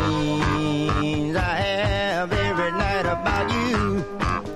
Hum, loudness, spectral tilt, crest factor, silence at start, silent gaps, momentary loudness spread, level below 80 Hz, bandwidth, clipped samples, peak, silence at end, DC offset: none; -23 LUFS; -6 dB/octave; 14 dB; 0 s; none; 1 LU; -34 dBFS; 14 kHz; under 0.1%; -10 dBFS; 0 s; under 0.1%